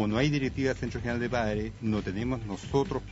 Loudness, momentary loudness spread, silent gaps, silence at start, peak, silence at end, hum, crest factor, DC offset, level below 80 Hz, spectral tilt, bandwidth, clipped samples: -30 LUFS; 6 LU; none; 0 s; -12 dBFS; 0 s; none; 18 dB; under 0.1%; -44 dBFS; -6.5 dB/octave; 8 kHz; under 0.1%